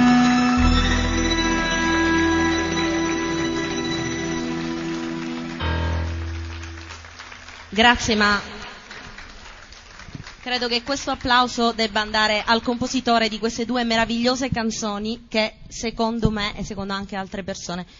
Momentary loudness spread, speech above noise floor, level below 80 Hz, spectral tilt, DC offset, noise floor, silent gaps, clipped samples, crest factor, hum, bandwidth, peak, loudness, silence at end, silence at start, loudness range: 19 LU; 20 dB; -34 dBFS; -4 dB/octave; under 0.1%; -42 dBFS; none; under 0.1%; 20 dB; none; 7.6 kHz; -2 dBFS; -21 LUFS; 0.15 s; 0 s; 6 LU